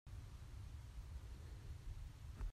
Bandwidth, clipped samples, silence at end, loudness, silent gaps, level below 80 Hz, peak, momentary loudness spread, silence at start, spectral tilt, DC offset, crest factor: 14.5 kHz; under 0.1%; 0 s; -55 LUFS; none; -52 dBFS; -36 dBFS; 2 LU; 0.05 s; -6 dB/octave; under 0.1%; 14 dB